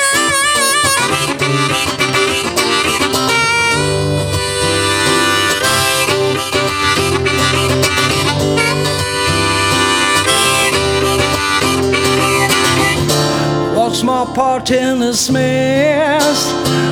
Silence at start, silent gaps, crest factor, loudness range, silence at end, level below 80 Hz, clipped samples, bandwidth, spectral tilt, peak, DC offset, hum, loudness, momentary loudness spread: 0 s; none; 14 dB; 1 LU; 0 s; -36 dBFS; under 0.1%; 18.5 kHz; -3 dB/octave; 0 dBFS; under 0.1%; none; -12 LUFS; 4 LU